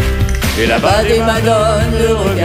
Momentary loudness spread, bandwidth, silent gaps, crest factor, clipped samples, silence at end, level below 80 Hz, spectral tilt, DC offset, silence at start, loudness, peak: 4 LU; 16 kHz; none; 12 dB; under 0.1%; 0 s; -20 dBFS; -5 dB/octave; under 0.1%; 0 s; -12 LUFS; 0 dBFS